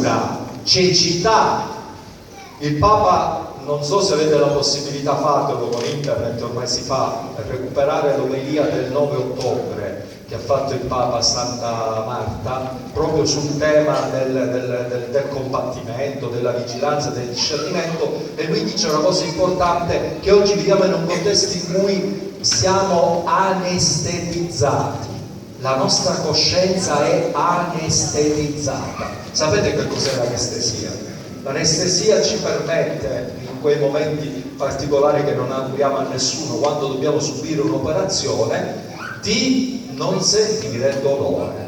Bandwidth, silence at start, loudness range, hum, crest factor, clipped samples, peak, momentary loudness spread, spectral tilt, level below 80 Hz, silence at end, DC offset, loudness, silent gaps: 18.5 kHz; 0 s; 4 LU; none; 16 dB; under 0.1%; -2 dBFS; 10 LU; -4 dB/octave; -44 dBFS; 0 s; under 0.1%; -19 LUFS; none